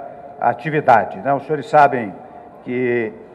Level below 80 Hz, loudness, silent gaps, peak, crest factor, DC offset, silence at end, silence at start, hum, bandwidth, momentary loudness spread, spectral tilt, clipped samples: -62 dBFS; -17 LUFS; none; -2 dBFS; 16 dB; under 0.1%; 0 s; 0 s; none; 9.2 kHz; 17 LU; -7.5 dB/octave; under 0.1%